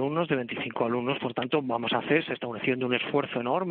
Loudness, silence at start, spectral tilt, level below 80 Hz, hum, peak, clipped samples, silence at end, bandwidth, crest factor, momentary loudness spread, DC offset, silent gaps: -28 LUFS; 0 s; -3.5 dB/octave; -70 dBFS; none; -10 dBFS; under 0.1%; 0 s; 4.5 kHz; 18 dB; 4 LU; under 0.1%; none